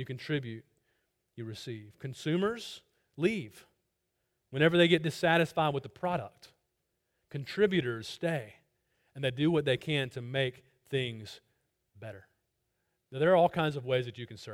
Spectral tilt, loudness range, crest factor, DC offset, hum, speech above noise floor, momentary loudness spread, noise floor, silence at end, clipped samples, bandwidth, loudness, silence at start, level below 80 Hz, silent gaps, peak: -6 dB/octave; 7 LU; 22 dB; under 0.1%; none; 50 dB; 20 LU; -81 dBFS; 0 s; under 0.1%; 16 kHz; -31 LUFS; 0 s; -68 dBFS; none; -10 dBFS